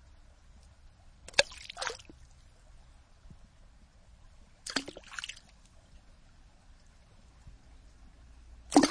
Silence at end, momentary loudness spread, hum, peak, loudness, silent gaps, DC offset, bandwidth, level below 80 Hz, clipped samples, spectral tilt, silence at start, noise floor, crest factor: 0 s; 30 LU; none; -6 dBFS; -33 LUFS; none; under 0.1%; 10.5 kHz; -56 dBFS; under 0.1%; -2.5 dB/octave; 1.35 s; -58 dBFS; 32 dB